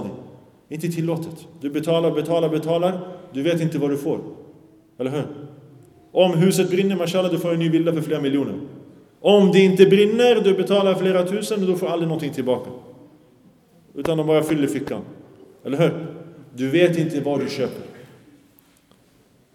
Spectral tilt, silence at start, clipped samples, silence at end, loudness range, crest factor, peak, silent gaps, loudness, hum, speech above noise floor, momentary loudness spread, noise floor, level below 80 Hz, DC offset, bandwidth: -6.5 dB/octave; 0 s; under 0.1%; 1.5 s; 8 LU; 20 dB; 0 dBFS; none; -20 LUFS; none; 37 dB; 19 LU; -57 dBFS; -64 dBFS; under 0.1%; 15.5 kHz